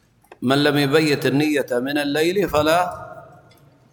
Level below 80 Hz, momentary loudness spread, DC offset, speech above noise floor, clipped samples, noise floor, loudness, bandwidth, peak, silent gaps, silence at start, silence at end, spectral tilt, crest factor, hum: -50 dBFS; 10 LU; under 0.1%; 33 dB; under 0.1%; -52 dBFS; -19 LUFS; 19 kHz; -4 dBFS; none; 0.4 s; 0.7 s; -5 dB/octave; 16 dB; none